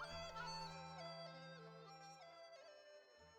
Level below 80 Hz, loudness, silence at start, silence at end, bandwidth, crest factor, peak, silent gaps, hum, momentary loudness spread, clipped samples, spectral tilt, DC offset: -72 dBFS; -54 LUFS; 0 s; 0 s; 19.5 kHz; 16 dB; -38 dBFS; none; none; 13 LU; under 0.1%; -3.5 dB/octave; under 0.1%